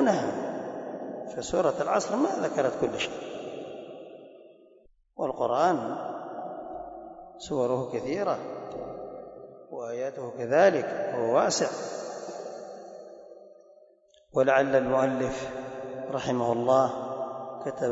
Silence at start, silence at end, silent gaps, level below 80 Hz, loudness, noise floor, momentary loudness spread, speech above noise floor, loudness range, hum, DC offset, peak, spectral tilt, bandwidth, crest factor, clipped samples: 0 s; 0 s; none; -64 dBFS; -28 LUFS; -60 dBFS; 20 LU; 34 dB; 6 LU; none; under 0.1%; -10 dBFS; -4.5 dB/octave; 8 kHz; 20 dB; under 0.1%